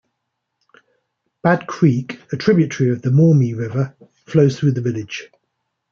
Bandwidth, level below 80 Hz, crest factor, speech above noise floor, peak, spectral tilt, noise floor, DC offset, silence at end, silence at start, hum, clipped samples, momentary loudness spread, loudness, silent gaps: 7.2 kHz; -60 dBFS; 16 dB; 60 dB; -2 dBFS; -8 dB/octave; -76 dBFS; under 0.1%; 0.65 s; 1.45 s; none; under 0.1%; 12 LU; -18 LUFS; none